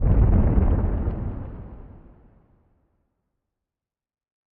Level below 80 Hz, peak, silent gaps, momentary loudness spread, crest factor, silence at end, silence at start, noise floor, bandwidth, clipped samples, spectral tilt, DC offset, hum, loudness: -26 dBFS; -6 dBFS; none; 22 LU; 18 dB; 2.55 s; 0 s; under -90 dBFS; 3 kHz; under 0.1%; -11.5 dB/octave; under 0.1%; none; -23 LUFS